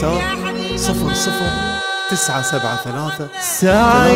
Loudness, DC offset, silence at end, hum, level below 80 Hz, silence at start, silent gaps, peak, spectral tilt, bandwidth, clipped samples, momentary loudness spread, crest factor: -17 LUFS; under 0.1%; 0 s; none; -34 dBFS; 0 s; none; 0 dBFS; -3.5 dB/octave; 16.5 kHz; under 0.1%; 9 LU; 16 dB